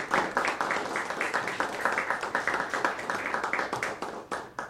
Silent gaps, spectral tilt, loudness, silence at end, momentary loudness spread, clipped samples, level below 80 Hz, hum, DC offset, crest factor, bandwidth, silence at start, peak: none; -3 dB/octave; -30 LUFS; 0 s; 5 LU; under 0.1%; -66 dBFS; none; under 0.1%; 22 dB; 16 kHz; 0 s; -10 dBFS